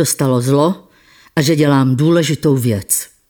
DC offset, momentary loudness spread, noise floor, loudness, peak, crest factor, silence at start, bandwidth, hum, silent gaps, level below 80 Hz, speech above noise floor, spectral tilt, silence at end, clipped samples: under 0.1%; 5 LU; -48 dBFS; -14 LUFS; -2 dBFS; 12 dB; 0 s; 19.5 kHz; none; none; -52 dBFS; 35 dB; -5.5 dB/octave; 0.25 s; under 0.1%